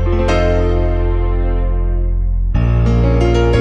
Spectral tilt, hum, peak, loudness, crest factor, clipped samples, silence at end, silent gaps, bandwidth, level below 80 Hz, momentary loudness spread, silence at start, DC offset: -8 dB/octave; none; -2 dBFS; -16 LUFS; 10 dB; under 0.1%; 0 s; none; 7.4 kHz; -16 dBFS; 6 LU; 0 s; under 0.1%